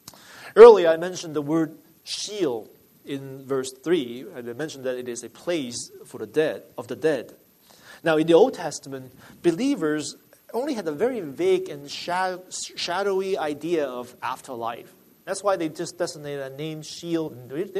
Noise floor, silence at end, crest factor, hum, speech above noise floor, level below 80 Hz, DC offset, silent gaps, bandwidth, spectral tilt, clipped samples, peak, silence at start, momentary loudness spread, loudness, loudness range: -51 dBFS; 0 s; 24 dB; none; 28 dB; -66 dBFS; under 0.1%; none; 13.5 kHz; -4.5 dB/octave; under 0.1%; 0 dBFS; 0.3 s; 16 LU; -23 LUFS; 6 LU